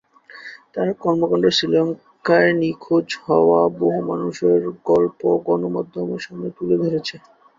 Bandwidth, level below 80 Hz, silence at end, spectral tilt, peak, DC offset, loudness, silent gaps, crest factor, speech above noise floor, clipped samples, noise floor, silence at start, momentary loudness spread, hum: 7.6 kHz; -60 dBFS; 0.4 s; -6 dB/octave; -2 dBFS; under 0.1%; -19 LUFS; none; 18 dB; 22 dB; under 0.1%; -41 dBFS; 0.35 s; 12 LU; none